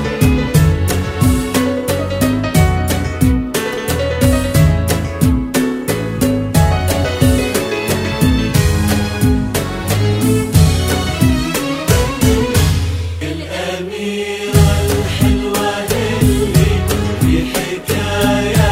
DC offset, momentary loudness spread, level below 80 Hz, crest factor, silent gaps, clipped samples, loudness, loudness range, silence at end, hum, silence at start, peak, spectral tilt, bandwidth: under 0.1%; 6 LU; -24 dBFS; 14 dB; none; under 0.1%; -15 LUFS; 2 LU; 0 s; none; 0 s; 0 dBFS; -5.5 dB/octave; 16.5 kHz